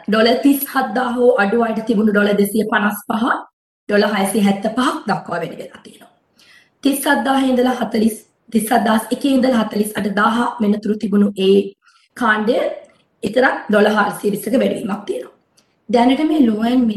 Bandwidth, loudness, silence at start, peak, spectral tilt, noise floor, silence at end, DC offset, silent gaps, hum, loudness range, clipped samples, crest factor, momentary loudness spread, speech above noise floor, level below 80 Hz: 12.5 kHz; -17 LUFS; 0.1 s; -2 dBFS; -5 dB/octave; -59 dBFS; 0 s; under 0.1%; 3.53-3.87 s; none; 3 LU; under 0.1%; 16 dB; 9 LU; 43 dB; -56 dBFS